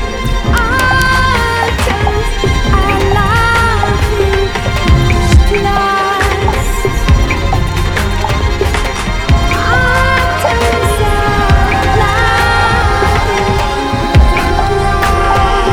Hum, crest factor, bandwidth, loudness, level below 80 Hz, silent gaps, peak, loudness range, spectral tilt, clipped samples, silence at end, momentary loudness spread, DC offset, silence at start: none; 10 dB; 17.5 kHz; -11 LUFS; -16 dBFS; none; 0 dBFS; 2 LU; -5 dB/octave; under 0.1%; 0 s; 5 LU; under 0.1%; 0 s